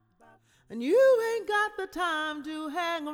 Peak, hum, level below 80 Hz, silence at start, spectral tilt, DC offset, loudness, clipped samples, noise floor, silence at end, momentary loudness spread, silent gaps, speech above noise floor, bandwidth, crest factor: -14 dBFS; none; -66 dBFS; 0.7 s; -3 dB/octave; under 0.1%; -27 LUFS; under 0.1%; -60 dBFS; 0 s; 13 LU; none; 33 dB; 17 kHz; 14 dB